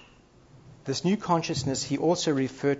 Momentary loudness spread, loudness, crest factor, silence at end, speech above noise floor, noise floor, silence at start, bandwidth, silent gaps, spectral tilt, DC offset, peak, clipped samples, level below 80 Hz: 5 LU; -27 LUFS; 18 dB; 0 s; 29 dB; -56 dBFS; 0.65 s; 8 kHz; none; -5 dB/octave; under 0.1%; -10 dBFS; under 0.1%; -60 dBFS